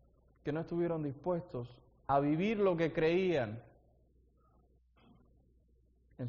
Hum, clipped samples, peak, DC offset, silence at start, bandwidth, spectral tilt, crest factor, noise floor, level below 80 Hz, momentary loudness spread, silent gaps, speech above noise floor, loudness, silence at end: none; under 0.1%; -18 dBFS; under 0.1%; 0.45 s; 6.6 kHz; -6 dB/octave; 18 dB; -69 dBFS; -64 dBFS; 14 LU; none; 36 dB; -34 LUFS; 0 s